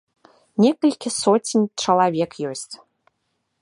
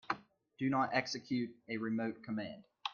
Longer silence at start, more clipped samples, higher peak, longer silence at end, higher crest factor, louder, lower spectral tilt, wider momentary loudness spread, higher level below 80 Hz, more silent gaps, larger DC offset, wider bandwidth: first, 0.6 s vs 0.1 s; neither; first, -4 dBFS vs -18 dBFS; first, 0.85 s vs 0 s; about the same, 18 dB vs 20 dB; first, -20 LUFS vs -38 LUFS; about the same, -4.5 dB/octave vs -5 dB/octave; first, 14 LU vs 9 LU; first, -68 dBFS vs -78 dBFS; neither; neither; first, 11.5 kHz vs 7.4 kHz